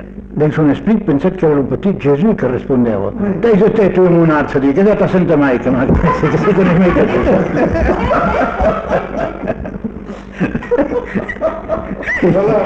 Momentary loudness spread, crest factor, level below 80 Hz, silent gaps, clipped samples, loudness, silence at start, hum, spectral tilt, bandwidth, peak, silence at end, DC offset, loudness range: 10 LU; 12 dB; -28 dBFS; none; under 0.1%; -13 LUFS; 0 s; none; -9 dB/octave; 7.6 kHz; -2 dBFS; 0 s; under 0.1%; 6 LU